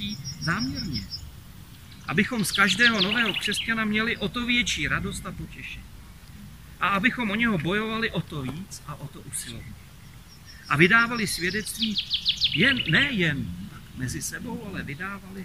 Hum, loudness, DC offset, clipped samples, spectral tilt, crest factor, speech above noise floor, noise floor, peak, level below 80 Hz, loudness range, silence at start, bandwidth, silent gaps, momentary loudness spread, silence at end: none; -24 LUFS; 0.2%; under 0.1%; -3.5 dB/octave; 24 dB; 21 dB; -47 dBFS; -2 dBFS; -48 dBFS; 5 LU; 0 s; 16 kHz; none; 19 LU; 0 s